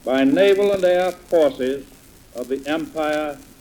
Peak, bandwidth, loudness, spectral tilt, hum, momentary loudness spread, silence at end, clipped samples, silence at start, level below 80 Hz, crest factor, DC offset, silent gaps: -4 dBFS; over 20 kHz; -19 LUFS; -5 dB/octave; none; 14 LU; 0.2 s; under 0.1%; 0.05 s; -52 dBFS; 14 dB; under 0.1%; none